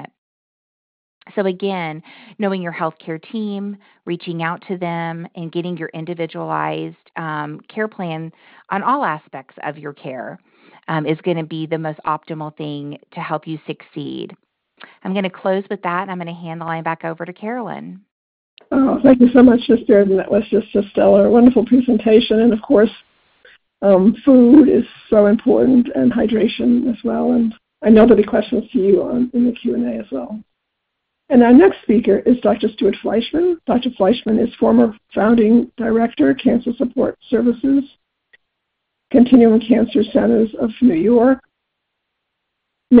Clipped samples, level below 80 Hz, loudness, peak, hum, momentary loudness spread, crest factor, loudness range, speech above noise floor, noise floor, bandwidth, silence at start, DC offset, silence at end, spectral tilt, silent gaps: under 0.1%; -50 dBFS; -16 LUFS; 0 dBFS; none; 18 LU; 16 dB; 12 LU; 60 dB; -75 dBFS; 4.9 kHz; 0 s; under 0.1%; 0 s; -11 dB/octave; 0.18-1.21 s, 18.11-18.57 s